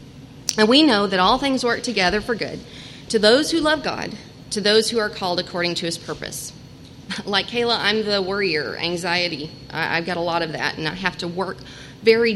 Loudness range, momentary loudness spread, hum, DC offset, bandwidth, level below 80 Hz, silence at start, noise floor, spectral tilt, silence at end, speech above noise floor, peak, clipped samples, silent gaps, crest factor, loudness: 4 LU; 15 LU; none; under 0.1%; 16 kHz; -50 dBFS; 0 s; -41 dBFS; -3.5 dB/octave; 0 s; 20 dB; 0 dBFS; under 0.1%; none; 20 dB; -20 LUFS